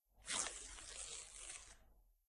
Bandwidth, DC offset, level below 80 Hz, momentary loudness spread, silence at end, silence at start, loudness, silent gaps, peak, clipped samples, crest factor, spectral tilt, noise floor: 13 kHz; under 0.1%; -66 dBFS; 15 LU; 0.15 s; 0.15 s; -47 LUFS; none; -20 dBFS; under 0.1%; 32 dB; 0.5 dB/octave; -70 dBFS